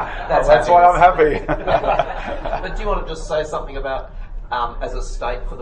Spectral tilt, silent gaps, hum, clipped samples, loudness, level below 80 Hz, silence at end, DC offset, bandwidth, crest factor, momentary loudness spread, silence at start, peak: -5.5 dB/octave; none; none; under 0.1%; -18 LUFS; -28 dBFS; 0 s; under 0.1%; 9.4 kHz; 18 dB; 15 LU; 0 s; 0 dBFS